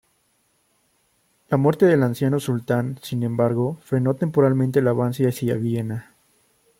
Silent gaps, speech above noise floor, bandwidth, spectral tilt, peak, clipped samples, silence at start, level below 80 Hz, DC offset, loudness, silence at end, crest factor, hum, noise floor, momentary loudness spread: none; 46 dB; 16.5 kHz; -8 dB/octave; -4 dBFS; under 0.1%; 1.5 s; -62 dBFS; under 0.1%; -21 LUFS; 0.75 s; 18 dB; none; -66 dBFS; 8 LU